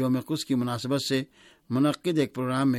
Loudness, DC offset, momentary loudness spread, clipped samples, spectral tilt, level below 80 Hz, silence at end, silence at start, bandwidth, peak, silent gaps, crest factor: -27 LUFS; under 0.1%; 5 LU; under 0.1%; -6 dB/octave; -66 dBFS; 0 s; 0 s; 16 kHz; -12 dBFS; none; 14 dB